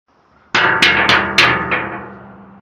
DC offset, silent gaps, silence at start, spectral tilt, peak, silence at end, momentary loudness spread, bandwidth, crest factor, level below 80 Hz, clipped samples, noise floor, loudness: under 0.1%; none; 0.55 s; -3 dB/octave; 0 dBFS; 0.2 s; 11 LU; 17 kHz; 16 dB; -44 dBFS; under 0.1%; -38 dBFS; -12 LUFS